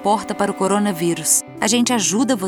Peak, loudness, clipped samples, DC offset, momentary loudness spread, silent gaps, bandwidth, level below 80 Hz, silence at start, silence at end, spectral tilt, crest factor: -2 dBFS; -18 LUFS; under 0.1%; under 0.1%; 4 LU; none; over 20 kHz; -58 dBFS; 0 s; 0 s; -3 dB/octave; 16 dB